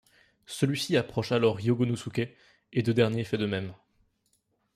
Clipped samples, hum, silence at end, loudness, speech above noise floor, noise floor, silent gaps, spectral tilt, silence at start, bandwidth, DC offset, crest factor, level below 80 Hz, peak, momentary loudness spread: under 0.1%; none; 1 s; -28 LUFS; 46 dB; -73 dBFS; none; -6 dB/octave; 0.5 s; 15 kHz; under 0.1%; 20 dB; -64 dBFS; -10 dBFS; 9 LU